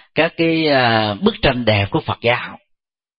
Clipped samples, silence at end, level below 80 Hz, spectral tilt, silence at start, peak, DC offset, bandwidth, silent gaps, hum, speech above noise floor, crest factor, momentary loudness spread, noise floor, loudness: under 0.1%; 0.6 s; -40 dBFS; -11 dB/octave; 0.15 s; 0 dBFS; under 0.1%; 5.4 kHz; none; none; 54 dB; 18 dB; 6 LU; -70 dBFS; -16 LUFS